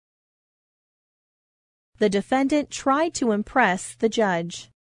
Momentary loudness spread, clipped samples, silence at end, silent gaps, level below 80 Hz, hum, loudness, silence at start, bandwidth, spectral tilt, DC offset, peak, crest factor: 4 LU; under 0.1%; 0.15 s; none; -58 dBFS; none; -23 LUFS; 2 s; 11 kHz; -4.5 dB/octave; under 0.1%; -4 dBFS; 22 dB